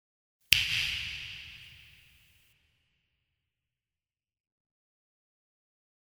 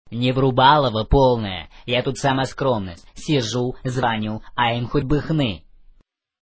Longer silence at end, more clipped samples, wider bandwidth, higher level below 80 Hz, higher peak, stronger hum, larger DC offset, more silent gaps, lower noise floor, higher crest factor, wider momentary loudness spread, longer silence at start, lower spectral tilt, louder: first, 4.3 s vs 0.85 s; neither; first, over 20 kHz vs 8 kHz; second, -60 dBFS vs -36 dBFS; about the same, 0 dBFS vs -2 dBFS; neither; neither; neither; first, under -90 dBFS vs -57 dBFS; first, 38 dB vs 20 dB; first, 24 LU vs 11 LU; first, 0.5 s vs 0.05 s; second, 0.5 dB/octave vs -6 dB/octave; second, -28 LUFS vs -20 LUFS